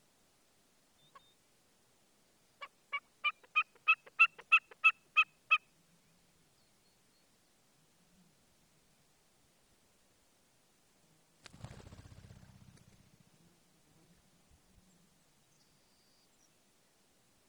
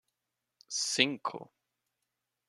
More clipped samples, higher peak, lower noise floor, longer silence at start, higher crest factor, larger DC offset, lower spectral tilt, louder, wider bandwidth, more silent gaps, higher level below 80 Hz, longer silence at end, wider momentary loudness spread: neither; second, -14 dBFS vs -6 dBFS; second, -72 dBFS vs -87 dBFS; first, 2.6 s vs 0.7 s; second, 26 dB vs 32 dB; neither; about the same, -1.5 dB/octave vs -1.5 dB/octave; about the same, -30 LUFS vs -31 LUFS; first, over 20 kHz vs 14 kHz; neither; first, -74 dBFS vs -84 dBFS; first, 11.9 s vs 1.05 s; first, 28 LU vs 13 LU